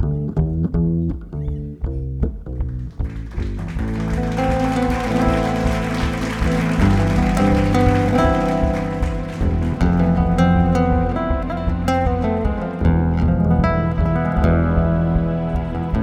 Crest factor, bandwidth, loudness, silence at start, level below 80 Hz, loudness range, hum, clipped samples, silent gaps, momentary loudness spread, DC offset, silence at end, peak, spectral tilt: 14 dB; 12 kHz; -19 LUFS; 0 s; -24 dBFS; 6 LU; none; under 0.1%; none; 10 LU; 0.1%; 0 s; -4 dBFS; -8 dB/octave